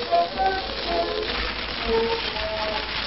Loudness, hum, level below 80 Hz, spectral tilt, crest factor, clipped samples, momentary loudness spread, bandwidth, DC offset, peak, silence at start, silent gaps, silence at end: -25 LUFS; none; -40 dBFS; -7 dB/octave; 16 dB; under 0.1%; 3 LU; 6 kHz; 0.3%; -8 dBFS; 0 s; none; 0 s